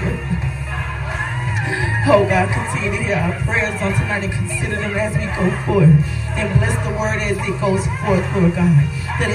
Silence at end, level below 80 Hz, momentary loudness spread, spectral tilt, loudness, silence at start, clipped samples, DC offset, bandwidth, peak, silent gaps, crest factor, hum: 0 s; -30 dBFS; 8 LU; -6.5 dB/octave; -18 LUFS; 0 s; under 0.1%; under 0.1%; 12.5 kHz; 0 dBFS; none; 18 dB; none